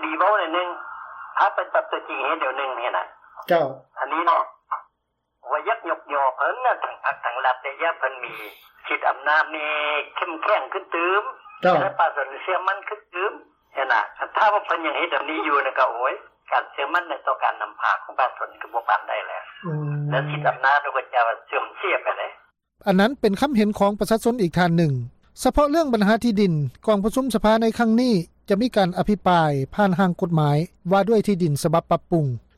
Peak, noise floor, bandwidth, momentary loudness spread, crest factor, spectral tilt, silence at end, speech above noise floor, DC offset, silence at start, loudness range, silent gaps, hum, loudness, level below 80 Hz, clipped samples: -8 dBFS; -75 dBFS; 15.5 kHz; 10 LU; 14 dB; -6 dB/octave; 0.2 s; 53 dB; under 0.1%; 0 s; 4 LU; none; none; -22 LUFS; -50 dBFS; under 0.1%